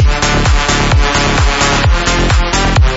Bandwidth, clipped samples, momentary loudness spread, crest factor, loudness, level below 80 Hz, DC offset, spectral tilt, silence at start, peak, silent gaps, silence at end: 8 kHz; under 0.1%; 1 LU; 10 dB; -11 LUFS; -14 dBFS; under 0.1%; -4 dB/octave; 0 s; 0 dBFS; none; 0 s